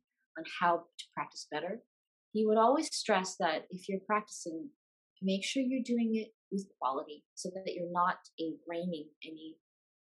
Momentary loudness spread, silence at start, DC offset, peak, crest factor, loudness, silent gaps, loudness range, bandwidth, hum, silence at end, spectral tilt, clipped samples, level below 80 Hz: 16 LU; 0.35 s; under 0.1%; -16 dBFS; 20 dB; -35 LUFS; 1.87-2.32 s, 4.76-5.16 s, 6.34-6.51 s, 7.25-7.36 s, 8.33-8.38 s, 9.16-9.21 s; 5 LU; 12 kHz; none; 0.65 s; -4.5 dB/octave; under 0.1%; under -90 dBFS